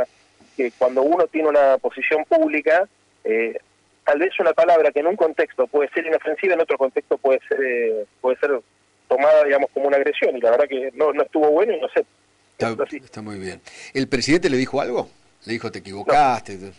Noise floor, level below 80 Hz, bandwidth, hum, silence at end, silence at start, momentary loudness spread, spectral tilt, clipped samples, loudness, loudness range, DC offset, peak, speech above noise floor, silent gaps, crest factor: -54 dBFS; -56 dBFS; 11 kHz; none; 0.05 s; 0 s; 12 LU; -5 dB/octave; under 0.1%; -20 LUFS; 5 LU; under 0.1%; -8 dBFS; 35 dB; none; 12 dB